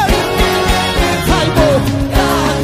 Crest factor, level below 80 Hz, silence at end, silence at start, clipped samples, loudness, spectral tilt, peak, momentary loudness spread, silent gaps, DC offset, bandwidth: 12 dB; -20 dBFS; 0 s; 0 s; under 0.1%; -13 LUFS; -5 dB/octave; 0 dBFS; 3 LU; none; under 0.1%; 15.5 kHz